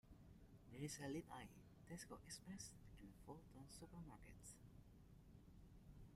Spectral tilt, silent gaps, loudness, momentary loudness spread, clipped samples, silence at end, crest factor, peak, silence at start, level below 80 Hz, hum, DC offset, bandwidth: -4.5 dB/octave; none; -59 LUFS; 15 LU; under 0.1%; 0 s; 20 dB; -40 dBFS; 0.05 s; -70 dBFS; none; under 0.1%; 15.5 kHz